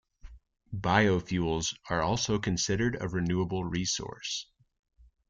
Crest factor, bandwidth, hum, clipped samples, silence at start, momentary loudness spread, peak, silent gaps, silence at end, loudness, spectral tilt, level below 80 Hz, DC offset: 22 dB; 9.4 kHz; none; under 0.1%; 0.25 s; 10 LU; -10 dBFS; none; 0.85 s; -30 LUFS; -4.5 dB/octave; -50 dBFS; under 0.1%